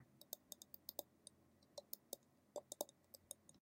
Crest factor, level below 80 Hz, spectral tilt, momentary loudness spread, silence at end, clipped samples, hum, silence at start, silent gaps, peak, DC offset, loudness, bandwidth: 34 dB; under -90 dBFS; -2 dB/octave; 12 LU; 0 s; under 0.1%; none; 0 s; none; -24 dBFS; under 0.1%; -55 LUFS; 16.5 kHz